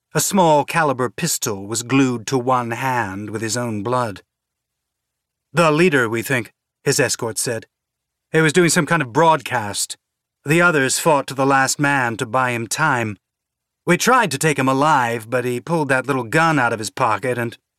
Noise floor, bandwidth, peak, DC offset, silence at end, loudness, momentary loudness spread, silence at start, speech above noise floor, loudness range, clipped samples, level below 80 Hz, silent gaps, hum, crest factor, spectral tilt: -81 dBFS; 16 kHz; -2 dBFS; under 0.1%; 0.25 s; -18 LUFS; 9 LU; 0.15 s; 63 dB; 4 LU; under 0.1%; -64 dBFS; none; none; 18 dB; -4 dB/octave